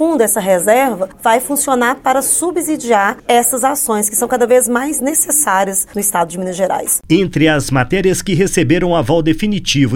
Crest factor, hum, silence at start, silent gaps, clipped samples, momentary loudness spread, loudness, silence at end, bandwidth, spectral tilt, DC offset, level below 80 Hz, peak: 14 dB; none; 0 s; none; under 0.1%; 5 LU; -13 LUFS; 0 s; 17 kHz; -4 dB/octave; under 0.1%; -36 dBFS; 0 dBFS